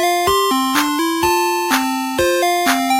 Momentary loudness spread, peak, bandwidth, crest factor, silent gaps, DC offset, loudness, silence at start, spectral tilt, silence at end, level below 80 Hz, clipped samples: 2 LU; 0 dBFS; 16 kHz; 16 dB; none; under 0.1%; -16 LUFS; 0 s; -2.5 dB/octave; 0 s; -46 dBFS; under 0.1%